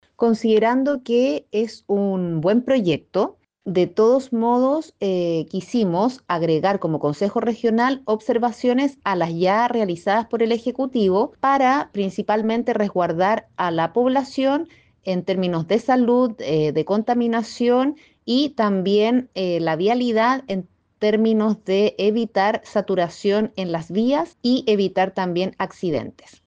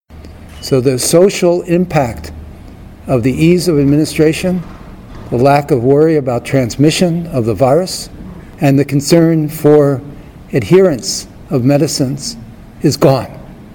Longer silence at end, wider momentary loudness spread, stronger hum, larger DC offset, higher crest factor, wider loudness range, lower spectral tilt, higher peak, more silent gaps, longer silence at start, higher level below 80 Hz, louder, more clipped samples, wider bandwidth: first, 0.35 s vs 0 s; second, 6 LU vs 17 LU; neither; neither; about the same, 12 dB vs 12 dB; about the same, 1 LU vs 2 LU; about the same, -6.5 dB/octave vs -6 dB/octave; second, -8 dBFS vs 0 dBFS; neither; about the same, 0.2 s vs 0.1 s; second, -62 dBFS vs -36 dBFS; second, -20 LUFS vs -12 LUFS; second, under 0.1% vs 0.1%; second, 8.8 kHz vs 19.5 kHz